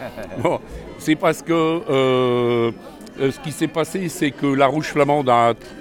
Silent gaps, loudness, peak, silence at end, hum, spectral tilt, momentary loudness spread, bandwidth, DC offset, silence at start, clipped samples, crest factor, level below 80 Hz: none; -19 LUFS; -2 dBFS; 0 s; none; -5.5 dB/octave; 10 LU; 18.5 kHz; under 0.1%; 0 s; under 0.1%; 18 dB; -48 dBFS